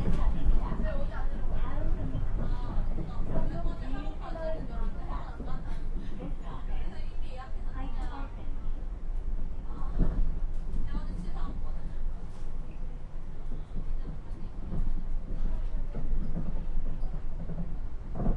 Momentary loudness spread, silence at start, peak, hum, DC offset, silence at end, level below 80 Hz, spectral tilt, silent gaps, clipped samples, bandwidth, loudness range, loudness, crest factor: 8 LU; 0 s; -12 dBFS; none; under 0.1%; 0 s; -30 dBFS; -8.5 dB/octave; none; under 0.1%; 4.1 kHz; 5 LU; -38 LUFS; 16 dB